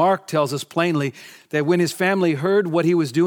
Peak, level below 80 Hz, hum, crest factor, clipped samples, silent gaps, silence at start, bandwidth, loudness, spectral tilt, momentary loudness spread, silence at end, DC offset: -4 dBFS; -72 dBFS; none; 16 dB; under 0.1%; none; 0 s; 18.5 kHz; -20 LUFS; -6 dB/octave; 5 LU; 0 s; under 0.1%